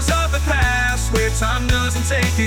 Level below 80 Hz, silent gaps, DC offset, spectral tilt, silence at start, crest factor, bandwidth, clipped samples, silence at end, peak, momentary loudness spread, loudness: -22 dBFS; none; under 0.1%; -4 dB/octave; 0 s; 12 dB; 18.5 kHz; under 0.1%; 0 s; -6 dBFS; 2 LU; -18 LUFS